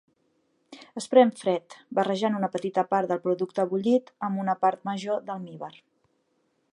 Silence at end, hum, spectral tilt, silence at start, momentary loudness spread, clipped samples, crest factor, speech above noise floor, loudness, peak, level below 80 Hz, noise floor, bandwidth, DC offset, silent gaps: 1.05 s; none; -6 dB/octave; 0.7 s; 15 LU; under 0.1%; 22 dB; 46 dB; -26 LUFS; -6 dBFS; -78 dBFS; -72 dBFS; 11.5 kHz; under 0.1%; none